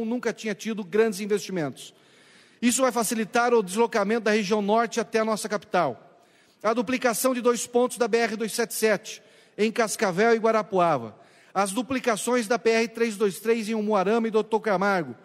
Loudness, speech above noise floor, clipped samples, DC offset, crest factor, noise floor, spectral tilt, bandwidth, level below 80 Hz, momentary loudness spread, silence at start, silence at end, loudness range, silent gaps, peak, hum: -25 LUFS; 34 dB; under 0.1%; under 0.1%; 18 dB; -58 dBFS; -4 dB/octave; 16 kHz; -74 dBFS; 7 LU; 0 s; 0.1 s; 2 LU; none; -6 dBFS; none